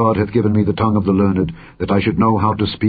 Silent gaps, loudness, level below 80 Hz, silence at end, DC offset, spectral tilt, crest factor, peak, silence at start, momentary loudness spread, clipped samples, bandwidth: none; -16 LUFS; -36 dBFS; 0 s; under 0.1%; -13 dB/octave; 14 dB; -2 dBFS; 0 s; 5 LU; under 0.1%; 4.9 kHz